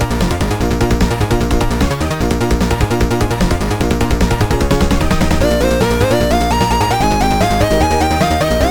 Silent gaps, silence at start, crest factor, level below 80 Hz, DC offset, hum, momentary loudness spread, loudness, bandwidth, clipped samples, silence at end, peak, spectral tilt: none; 0 s; 12 dB; -20 dBFS; under 0.1%; none; 3 LU; -14 LUFS; 18 kHz; under 0.1%; 0 s; 0 dBFS; -5.5 dB/octave